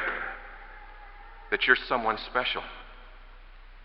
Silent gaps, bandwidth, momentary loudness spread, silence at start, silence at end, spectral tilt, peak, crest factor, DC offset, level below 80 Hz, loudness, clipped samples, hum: none; 5.8 kHz; 26 LU; 0 s; 0 s; -6.5 dB/octave; -6 dBFS; 26 dB; under 0.1%; -48 dBFS; -27 LUFS; under 0.1%; none